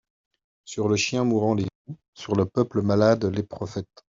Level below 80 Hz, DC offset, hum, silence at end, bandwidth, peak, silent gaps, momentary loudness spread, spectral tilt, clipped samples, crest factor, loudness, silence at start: -60 dBFS; under 0.1%; none; 0.35 s; 7.8 kHz; -6 dBFS; 1.75-1.85 s, 2.08-2.13 s; 16 LU; -6 dB/octave; under 0.1%; 20 dB; -24 LUFS; 0.65 s